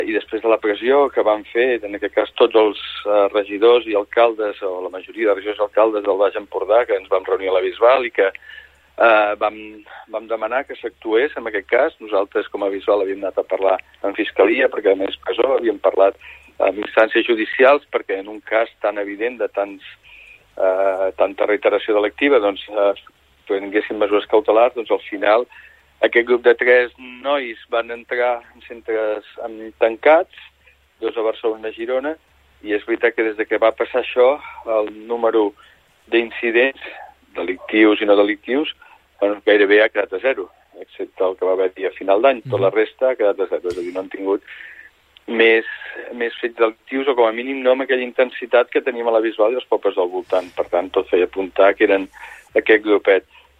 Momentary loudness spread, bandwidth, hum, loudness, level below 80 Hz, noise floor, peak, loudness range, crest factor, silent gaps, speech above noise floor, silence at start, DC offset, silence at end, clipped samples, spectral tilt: 12 LU; 5 kHz; none; -18 LUFS; -58 dBFS; -55 dBFS; -2 dBFS; 4 LU; 16 dB; none; 37 dB; 0 s; under 0.1%; 0.4 s; under 0.1%; -6 dB/octave